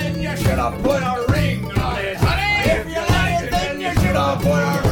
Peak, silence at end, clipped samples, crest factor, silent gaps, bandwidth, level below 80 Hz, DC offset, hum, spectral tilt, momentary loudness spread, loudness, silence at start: -4 dBFS; 0 s; under 0.1%; 14 dB; none; 19.5 kHz; -28 dBFS; under 0.1%; none; -5.5 dB/octave; 4 LU; -19 LUFS; 0 s